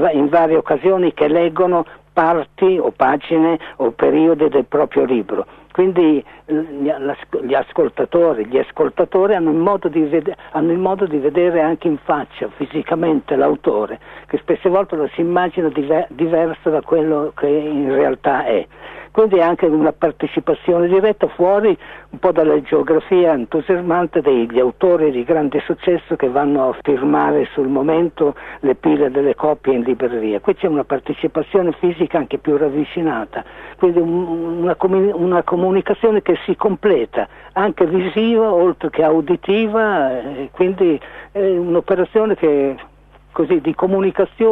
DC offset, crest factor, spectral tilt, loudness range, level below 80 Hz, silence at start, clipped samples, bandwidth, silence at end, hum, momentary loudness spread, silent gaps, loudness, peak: under 0.1%; 16 dB; -9.5 dB/octave; 3 LU; -50 dBFS; 0 s; under 0.1%; 4 kHz; 0 s; none; 7 LU; none; -16 LUFS; 0 dBFS